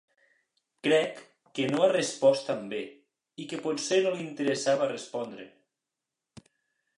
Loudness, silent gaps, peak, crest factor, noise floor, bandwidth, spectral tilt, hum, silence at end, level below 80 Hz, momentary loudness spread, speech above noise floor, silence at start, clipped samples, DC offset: -28 LUFS; none; -10 dBFS; 20 dB; -88 dBFS; 11 kHz; -4 dB/octave; none; 1.5 s; -80 dBFS; 16 LU; 60 dB; 0.85 s; under 0.1%; under 0.1%